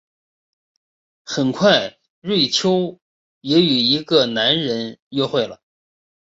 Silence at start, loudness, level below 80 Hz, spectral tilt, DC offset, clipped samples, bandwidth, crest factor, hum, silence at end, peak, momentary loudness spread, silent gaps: 1.25 s; -18 LUFS; -62 dBFS; -4.5 dB/octave; under 0.1%; under 0.1%; 8 kHz; 18 dB; none; 0.85 s; -2 dBFS; 13 LU; 2.10-2.22 s, 3.02-3.41 s, 4.99-5.11 s